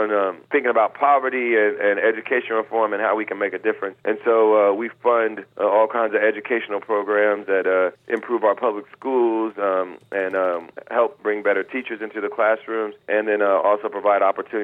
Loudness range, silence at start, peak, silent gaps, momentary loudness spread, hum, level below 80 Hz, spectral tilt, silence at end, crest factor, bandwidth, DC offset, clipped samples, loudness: 3 LU; 0 s; -6 dBFS; none; 7 LU; none; -78 dBFS; -7 dB/octave; 0 s; 16 dB; 4 kHz; under 0.1%; under 0.1%; -21 LUFS